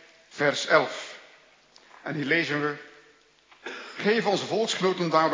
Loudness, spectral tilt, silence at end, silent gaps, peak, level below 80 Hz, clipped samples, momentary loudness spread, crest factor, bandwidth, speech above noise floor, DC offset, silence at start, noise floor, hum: -25 LUFS; -4 dB/octave; 0 s; none; -6 dBFS; -82 dBFS; under 0.1%; 18 LU; 22 dB; 7.6 kHz; 34 dB; under 0.1%; 0.35 s; -59 dBFS; none